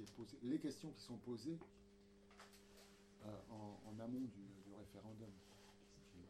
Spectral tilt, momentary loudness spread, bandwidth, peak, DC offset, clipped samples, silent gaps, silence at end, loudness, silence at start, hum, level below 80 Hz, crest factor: -6 dB/octave; 19 LU; 16 kHz; -32 dBFS; under 0.1%; under 0.1%; none; 0 s; -53 LUFS; 0 s; none; -76 dBFS; 20 dB